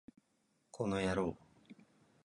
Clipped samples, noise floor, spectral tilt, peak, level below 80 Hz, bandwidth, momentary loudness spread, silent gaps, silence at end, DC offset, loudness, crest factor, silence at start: under 0.1%; -78 dBFS; -6 dB/octave; -20 dBFS; -62 dBFS; 11 kHz; 22 LU; none; 0.5 s; under 0.1%; -38 LUFS; 20 dB; 0.75 s